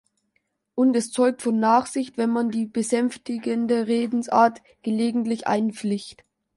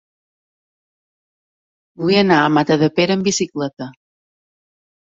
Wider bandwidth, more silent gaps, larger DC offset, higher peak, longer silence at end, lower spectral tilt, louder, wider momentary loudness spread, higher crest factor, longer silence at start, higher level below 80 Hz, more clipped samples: first, 11.5 kHz vs 8 kHz; second, none vs 3.73-3.77 s; neither; second, -6 dBFS vs -2 dBFS; second, 0.45 s vs 1.2 s; about the same, -5 dB/octave vs -4.5 dB/octave; second, -23 LUFS vs -16 LUFS; second, 9 LU vs 13 LU; about the same, 18 dB vs 18 dB; second, 0.75 s vs 2 s; second, -70 dBFS vs -60 dBFS; neither